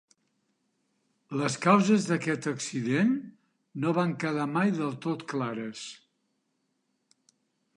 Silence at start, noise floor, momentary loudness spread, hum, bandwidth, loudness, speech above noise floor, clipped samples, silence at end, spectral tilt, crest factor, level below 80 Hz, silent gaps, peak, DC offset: 1.3 s; -77 dBFS; 14 LU; none; 11 kHz; -28 LUFS; 49 dB; under 0.1%; 1.8 s; -5.5 dB/octave; 22 dB; -78 dBFS; none; -8 dBFS; under 0.1%